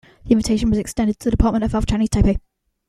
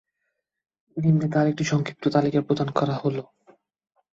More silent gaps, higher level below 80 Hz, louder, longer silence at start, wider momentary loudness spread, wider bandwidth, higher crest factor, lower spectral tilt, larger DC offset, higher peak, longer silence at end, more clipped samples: neither; first, -26 dBFS vs -62 dBFS; first, -19 LUFS vs -24 LUFS; second, 0.25 s vs 0.95 s; second, 3 LU vs 7 LU; first, 13.5 kHz vs 7.6 kHz; about the same, 16 dB vs 20 dB; about the same, -6.5 dB/octave vs -7 dB/octave; neither; about the same, -2 dBFS vs -4 dBFS; second, 0.5 s vs 0.9 s; neither